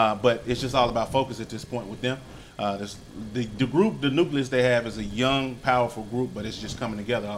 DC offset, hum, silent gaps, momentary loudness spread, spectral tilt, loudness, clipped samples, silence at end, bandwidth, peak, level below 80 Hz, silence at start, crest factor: under 0.1%; none; none; 11 LU; -5.5 dB/octave; -26 LUFS; under 0.1%; 0 s; 15.5 kHz; -6 dBFS; -48 dBFS; 0 s; 20 dB